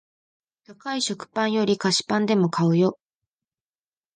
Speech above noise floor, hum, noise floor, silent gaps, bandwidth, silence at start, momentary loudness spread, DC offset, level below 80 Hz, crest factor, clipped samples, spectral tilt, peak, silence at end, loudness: over 68 dB; none; under -90 dBFS; none; 9.8 kHz; 0.7 s; 6 LU; under 0.1%; -68 dBFS; 18 dB; under 0.1%; -5 dB/octave; -8 dBFS; 1.2 s; -23 LUFS